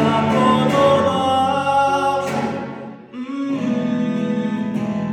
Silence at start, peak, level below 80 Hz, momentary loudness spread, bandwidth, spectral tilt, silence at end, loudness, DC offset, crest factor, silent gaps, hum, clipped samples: 0 s; -4 dBFS; -56 dBFS; 13 LU; 12.5 kHz; -6 dB/octave; 0 s; -18 LUFS; under 0.1%; 16 dB; none; none; under 0.1%